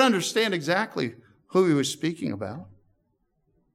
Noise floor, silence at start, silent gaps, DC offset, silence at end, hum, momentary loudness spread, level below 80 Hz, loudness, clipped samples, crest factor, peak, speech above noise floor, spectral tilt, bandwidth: -72 dBFS; 0 s; none; under 0.1%; 1.1 s; none; 12 LU; -72 dBFS; -25 LUFS; under 0.1%; 20 dB; -6 dBFS; 47 dB; -4.5 dB/octave; 16 kHz